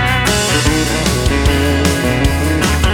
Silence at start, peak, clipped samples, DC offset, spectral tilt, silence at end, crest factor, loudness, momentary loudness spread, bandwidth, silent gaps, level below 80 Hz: 0 s; 0 dBFS; under 0.1%; under 0.1%; -4.5 dB/octave; 0 s; 12 dB; -13 LUFS; 2 LU; 18.5 kHz; none; -20 dBFS